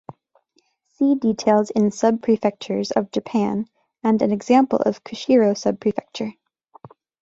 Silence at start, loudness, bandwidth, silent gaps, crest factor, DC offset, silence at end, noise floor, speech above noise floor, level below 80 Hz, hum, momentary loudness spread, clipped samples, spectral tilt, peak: 1 s; -20 LUFS; 7.8 kHz; none; 18 dB; under 0.1%; 0.9 s; -66 dBFS; 46 dB; -62 dBFS; none; 11 LU; under 0.1%; -6 dB/octave; -4 dBFS